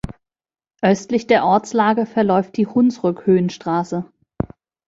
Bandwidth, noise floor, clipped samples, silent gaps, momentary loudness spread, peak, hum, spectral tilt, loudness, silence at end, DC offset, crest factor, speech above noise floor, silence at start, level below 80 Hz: 7.8 kHz; under -90 dBFS; under 0.1%; none; 13 LU; -2 dBFS; none; -6.5 dB/octave; -18 LUFS; 0.85 s; under 0.1%; 16 dB; over 73 dB; 0.05 s; -48 dBFS